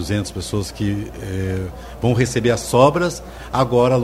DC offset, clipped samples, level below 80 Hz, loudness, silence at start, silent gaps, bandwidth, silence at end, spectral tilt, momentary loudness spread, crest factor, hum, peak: under 0.1%; under 0.1%; -38 dBFS; -19 LUFS; 0 s; none; 16 kHz; 0 s; -6 dB/octave; 12 LU; 18 dB; none; 0 dBFS